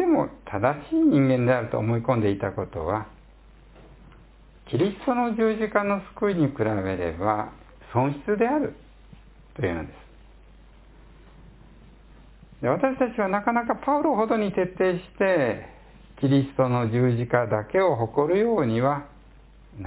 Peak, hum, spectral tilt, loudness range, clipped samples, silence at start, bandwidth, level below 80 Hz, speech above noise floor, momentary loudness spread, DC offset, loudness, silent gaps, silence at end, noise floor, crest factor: -6 dBFS; none; -11.5 dB/octave; 8 LU; under 0.1%; 0 s; 4 kHz; -50 dBFS; 27 dB; 8 LU; under 0.1%; -24 LUFS; none; 0 s; -51 dBFS; 20 dB